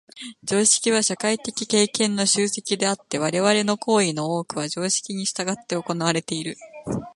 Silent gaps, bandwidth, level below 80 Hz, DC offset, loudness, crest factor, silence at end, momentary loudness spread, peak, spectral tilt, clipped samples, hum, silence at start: none; 11.5 kHz; -62 dBFS; under 0.1%; -22 LUFS; 20 dB; 0.05 s; 11 LU; -2 dBFS; -3 dB/octave; under 0.1%; none; 0.15 s